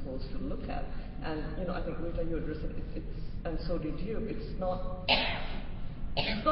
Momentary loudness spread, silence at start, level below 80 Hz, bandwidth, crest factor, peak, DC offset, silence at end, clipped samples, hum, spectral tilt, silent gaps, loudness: 13 LU; 0 s; -38 dBFS; 5.6 kHz; 22 dB; -10 dBFS; under 0.1%; 0 s; under 0.1%; none; -3.5 dB/octave; none; -36 LUFS